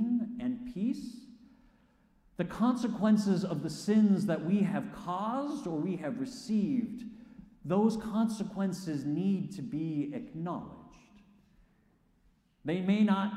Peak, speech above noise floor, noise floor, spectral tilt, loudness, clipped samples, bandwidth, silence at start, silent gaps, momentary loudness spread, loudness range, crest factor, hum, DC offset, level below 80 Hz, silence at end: -16 dBFS; 37 dB; -68 dBFS; -7 dB/octave; -32 LUFS; under 0.1%; 12 kHz; 0 s; none; 13 LU; 7 LU; 16 dB; none; under 0.1%; -66 dBFS; 0 s